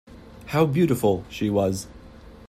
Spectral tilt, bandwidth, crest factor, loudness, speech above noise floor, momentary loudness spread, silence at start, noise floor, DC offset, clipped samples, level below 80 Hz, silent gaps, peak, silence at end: -6.5 dB/octave; 16 kHz; 18 dB; -23 LUFS; 23 dB; 15 LU; 0.1 s; -45 dBFS; under 0.1%; under 0.1%; -50 dBFS; none; -8 dBFS; 0.05 s